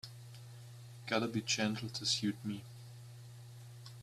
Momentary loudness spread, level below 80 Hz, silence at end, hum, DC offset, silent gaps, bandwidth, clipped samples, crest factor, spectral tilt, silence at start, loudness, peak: 19 LU; -74 dBFS; 0 s; none; under 0.1%; none; 14.5 kHz; under 0.1%; 22 dB; -3.5 dB/octave; 0.05 s; -36 LUFS; -18 dBFS